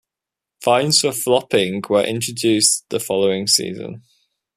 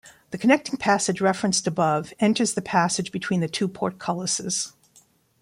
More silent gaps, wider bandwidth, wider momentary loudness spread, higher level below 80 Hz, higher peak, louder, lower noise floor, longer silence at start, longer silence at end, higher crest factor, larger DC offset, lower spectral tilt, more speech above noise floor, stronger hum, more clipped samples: neither; about the same, 15 kHz vs 15.5 kHz; first, 9 LU vs 6 LU; about the same, -62 dBFS vs -64 dBFS; first, 0 dBFS vs -4 dBFS; first, -17 LUFS vs -23 LUFS; first, -86 dBFS vs -59 dBFS; first, 0.6 s vs 0.05 s; second, 0.55 s vs 0.75 s; about the same, 20 dB vs 20 dB; neither; about the same, -3 dB/octave vs -4 dB/octave; first, 68 dB vs 36 dB; neither; neither